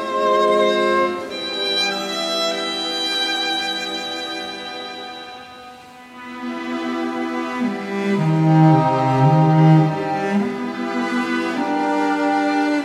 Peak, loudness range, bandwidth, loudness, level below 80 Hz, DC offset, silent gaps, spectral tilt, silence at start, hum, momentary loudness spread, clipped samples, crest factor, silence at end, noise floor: -2 dBFS; 11 LU; 12.5 kHz; -19 LUFS; -62 dBFS; under 0.1%; none; -6 dB/octave; 0 s; none; 16 LU; under 0.1%; 18 dB; 0 s; -40 dBFS